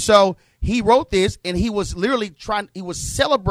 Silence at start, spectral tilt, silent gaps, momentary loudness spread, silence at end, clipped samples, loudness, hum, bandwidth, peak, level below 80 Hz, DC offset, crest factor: 0 s; -4.5 dB/octave; none; 10 LU; 0 s; under 0.1%; -20 LUFS; none; 15.5 kHz; -2 dBFS; -36 dBFS; under 0.1%; 18 dB